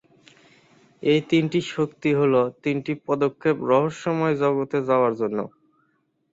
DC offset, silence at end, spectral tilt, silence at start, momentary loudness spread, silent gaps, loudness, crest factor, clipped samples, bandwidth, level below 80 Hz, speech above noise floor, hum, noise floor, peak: under 0.1%; 0.85 s; -7 dB/octave; 1 s; 7 LU; none; -23 LUFS; 16 dB; under 0.1%; 7.8 kHz; -66 dBFS; 47 dB; none; -69 dBFS; -6 dBFS